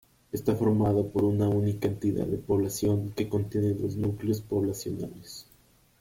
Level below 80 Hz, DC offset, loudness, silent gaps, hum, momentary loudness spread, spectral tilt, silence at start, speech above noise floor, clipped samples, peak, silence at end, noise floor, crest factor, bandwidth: -54 dBFS; under 0.1%; -28 LUFS; none; none; 11 LU; -7.5 dB/octave; 0.35 s; 34 dB; under 0.1%; -12 dBFS; 0.6 s; -61 dBFS; 16 dB; 16.5 kHz